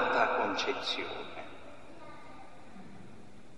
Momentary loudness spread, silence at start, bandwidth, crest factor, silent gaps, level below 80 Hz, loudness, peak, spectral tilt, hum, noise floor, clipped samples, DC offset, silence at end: 23 LU; 0 s; 12 kHz; 22 dB; none; -68 dBFS; -32 LUFS; -14 dBFS; -3 dB/octave; none; -54 dBFS; under 0.1%; 0.5%; 0 s